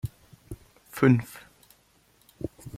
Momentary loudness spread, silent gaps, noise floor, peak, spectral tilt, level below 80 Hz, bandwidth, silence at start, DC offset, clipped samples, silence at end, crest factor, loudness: 24 LU; none; -63 dBFS; -8 dBFS; -7.5 dB/octave; -54 dBFS; 15.5 kHz; 0.05 s; under 0.1%; under 0.1%; 0 s; 22 dB; -26 LUFS